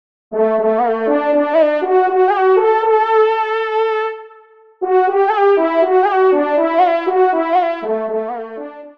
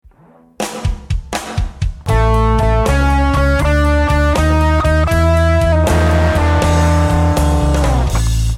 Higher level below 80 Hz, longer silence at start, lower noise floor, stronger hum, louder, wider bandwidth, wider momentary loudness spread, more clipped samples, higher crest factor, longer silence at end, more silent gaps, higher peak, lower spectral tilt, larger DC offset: second, -68 dBFS vs -16 dBFS; second, 0.3 s vs 0.6 s; about the same, -45 dBFS vs -46 dBFS; neither; about the same, -15 LUFS vs -14 LUFS; second, 5.6 kHz vs 14.5 kHz; about the same, 9 LU vs 9 LU; neither; about the same, 12 dB vs 12 dB; about the same, 0.05 s vs 0 s; neither; about the same, -2 dBFS vs -2 dBFS; about the same, -6.5 dB/octave vs -6 dB/octave; first, 0.2% vs under 0.1%